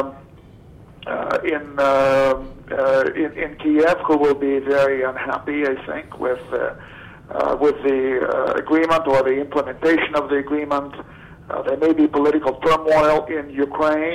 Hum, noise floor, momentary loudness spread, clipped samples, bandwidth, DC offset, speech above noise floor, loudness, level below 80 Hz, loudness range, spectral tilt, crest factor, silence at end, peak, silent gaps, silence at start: none; -44 dBFS; 11 LU; under 0.1%; 12.5 kHz; under 0.1%; 25 dB; -19 LUFS; -48 dBFS; 4 LU; -6 dB/octave; 14 dB; 0 s; -6 dBFS; none; 0 s